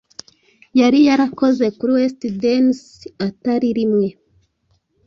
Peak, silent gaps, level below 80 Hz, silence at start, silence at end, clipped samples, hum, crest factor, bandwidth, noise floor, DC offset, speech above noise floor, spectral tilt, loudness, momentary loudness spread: -4 dBFS; none; -58 dBFS; 0.75 s; 0.95 s; under 0.1%; none; 14 dB; 7.4 kHz; -64 dBFS; under 0.1%; 48 dB; -6 dB/octave; -17 LUFS; 13 LU